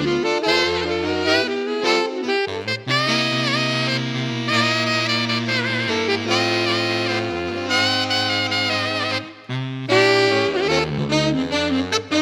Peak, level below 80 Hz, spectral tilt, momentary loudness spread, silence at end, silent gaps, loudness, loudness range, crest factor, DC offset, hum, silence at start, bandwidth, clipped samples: -4 dBFS; -52 dBFS; -4 dB/octave; 6 LU; 0 s; none; -19 LUFS; 1 LU; 16 dB; under 0.1%; none; 0 s; 16.5 kHz; under 0.1%